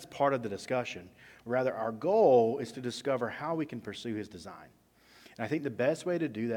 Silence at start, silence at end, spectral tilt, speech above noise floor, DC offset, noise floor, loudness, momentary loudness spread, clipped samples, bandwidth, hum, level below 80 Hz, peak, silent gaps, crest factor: 0 s; 0 s; -6 dB/octave; 28 dB; under 0.1%; -59 dBFS; -31 LUFS; 15 LU; under 0.1%; 17 kHz; none; -72 dBFS; -12 dBFS; none; 20 dB